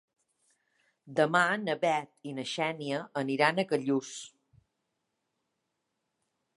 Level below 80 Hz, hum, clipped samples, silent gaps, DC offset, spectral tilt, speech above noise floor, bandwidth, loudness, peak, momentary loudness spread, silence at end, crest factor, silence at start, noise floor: -82 dBFS; none; under 0.1%; none; under 0.1%; -4.5 dB/octave; 53 dB; 11.5 kHz; -30 LUFS; -10 dBFS; 14 LU; 2.3 s; 24 dB; 1.05 s; -83 dBFS